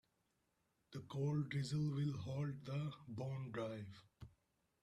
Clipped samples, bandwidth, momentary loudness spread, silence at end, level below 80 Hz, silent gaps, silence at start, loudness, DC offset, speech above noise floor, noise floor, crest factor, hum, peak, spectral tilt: under 0.1%; 10 kHz; 17 LU; 0.55 s; -74 dBFS; none; 0.9 s; -44 LUFS; under 0.1%; 41 dB; -84 dBFS; 14 dB; none; -32 dBFS; -7.5 dB/octave